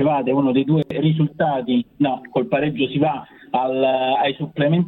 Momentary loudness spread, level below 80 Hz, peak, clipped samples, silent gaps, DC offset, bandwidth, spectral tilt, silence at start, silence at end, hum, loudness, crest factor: 4 LU; -56 dBFS; -6 dBFS; under 0.1%; none; under 0.1%; 4.2 kHz; -10 dB/octave; 0 s; 0 s; none; -20 LUFS; 14 dB